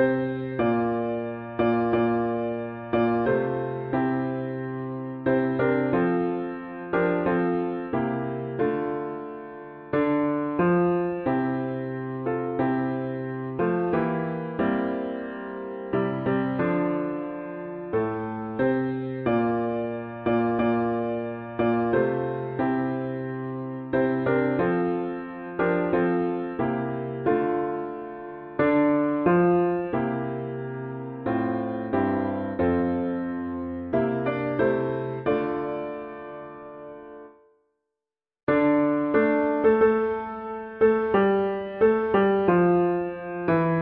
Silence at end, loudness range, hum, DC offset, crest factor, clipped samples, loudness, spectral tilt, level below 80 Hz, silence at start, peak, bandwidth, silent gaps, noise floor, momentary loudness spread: 0 s; 5 LU; none; under 0.1%; 16 dB; under 0.1%; -26 LUFS; -11.5 dB/octave; -56 dBFS; 0 s; -8 dBFS; 4.5 kHz; 38.43-38.47 s; -90 dBFS; 12 LU